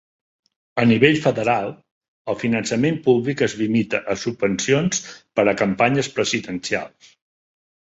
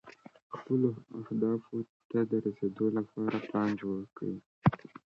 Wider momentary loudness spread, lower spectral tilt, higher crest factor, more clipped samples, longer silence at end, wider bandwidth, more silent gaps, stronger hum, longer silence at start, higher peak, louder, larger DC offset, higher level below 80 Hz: about the same, 10 LU vs 10 LU; second, -5 dB/octave vs -9.5 dB/octave; about the same, 20 dB vs 24 dB; neither; first, 1.05 s vs 0.25 s; first, 8 kHz vs 6.8 kHz; second, 1.91-2.01 s, 2.08-2.25 s vs 0.42-0.50 s, 1.89-2.10 s, 4.46-4.62 s; neither; first, 0.75 s vs 0.05 s; first, -2 dBFS vs -10 dBFS; first, -20 LUFS vs -33 LUFS; neither; first, -56 dBFS vs -66 dBFS